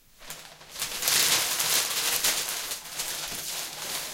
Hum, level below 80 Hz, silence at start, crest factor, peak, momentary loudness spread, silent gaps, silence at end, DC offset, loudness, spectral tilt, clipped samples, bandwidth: none; -60 dBFS; 0.2 s; 24 dB; -4 dBFS; 20 LU; none; 0 s; under 0.1%; -25 LUFS; 1 dB/octave; under 0.1%; 17 kHz